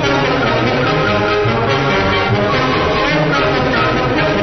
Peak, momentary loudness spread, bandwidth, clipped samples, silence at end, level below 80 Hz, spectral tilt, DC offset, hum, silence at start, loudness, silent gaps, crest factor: -2 dBFS; 1 LU; 6.4 kHz; under 0.1%; 0 s; -32 dBFS; -6 dB/octave; under 0.1%; none; 0 s; -14 LUFS; none; 12 dB